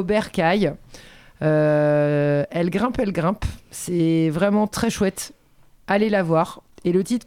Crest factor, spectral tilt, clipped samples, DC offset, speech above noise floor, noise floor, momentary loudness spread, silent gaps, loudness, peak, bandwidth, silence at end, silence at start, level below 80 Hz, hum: 16 dB; -6.5 dB/octave; under 0.1%; under 0.1%; 32 dB; -53 dBFS; 10 LU; none; -21 LUFS; -6 dBFS; 16 kHz; 0.1 s; 0 s; -44 dBFS; none